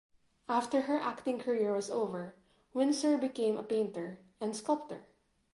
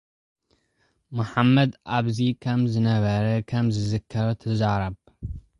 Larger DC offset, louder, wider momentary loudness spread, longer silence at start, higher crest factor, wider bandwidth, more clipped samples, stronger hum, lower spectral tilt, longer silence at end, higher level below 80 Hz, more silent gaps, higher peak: neither; second, -34 LUFS vs -24 LUFS; about the same, 13 LU vs 12 LU; second, 0.5 s vs 1.1 s; about the same, 16 dB vs 18 dB; about the same, 11.5 kHz vs 10.5 kHz; neither; neither; second, -5 dB/octave vs -7.5 dB/octave; first, 0.5 s vs 0.2 s; second, -78 dBFS vs -46 dBFS; neither; second, -18 dBFS vs -6 dBFS